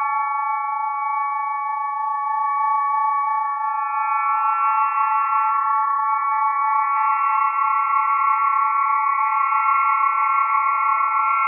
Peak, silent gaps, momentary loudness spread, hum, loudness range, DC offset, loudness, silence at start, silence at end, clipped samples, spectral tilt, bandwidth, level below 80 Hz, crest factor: -8 dBFS; none; 5 LU; none; 4 LU; under 0.1%; -19 LUFS; 0 s; 0 s; under 0.1%; -1.5 dB/octave; 2.9 kHz; under -90 dBFS; 12 dB